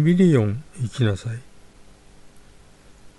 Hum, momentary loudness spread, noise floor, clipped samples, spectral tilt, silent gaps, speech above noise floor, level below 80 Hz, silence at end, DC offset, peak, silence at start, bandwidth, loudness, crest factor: 50 Hz at -55 dBFS; 16 LU; -48 dBFS; under 0.1%; -8 dB/octave; none; 29 dB; -52 dBFS; 0.1 s; under 0.1%; -6 dBFS; 0 s; 11.5 kHz; -21 LUFS; 16 dB